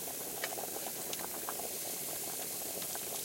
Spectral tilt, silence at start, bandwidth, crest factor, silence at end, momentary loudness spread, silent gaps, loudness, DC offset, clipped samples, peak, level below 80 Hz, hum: -1 dB/octave; 0 s; 16.5 kHz; 18 dB; 0 s; 1 LU; none; -37 LUFS; under 0.1%; under 0.1%; -22 dBFS; -72 dBFS; none